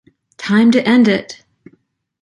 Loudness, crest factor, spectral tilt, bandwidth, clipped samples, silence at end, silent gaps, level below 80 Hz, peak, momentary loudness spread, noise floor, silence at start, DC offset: -13 LUFS; 14 dB; -6 dB/octave; 10.5 kHz; under 0.1%; 0.9 s; none; -58 dBFS; -2 dBFS; 16 LU; -58 dBFS; 0.4 s; under 0.1%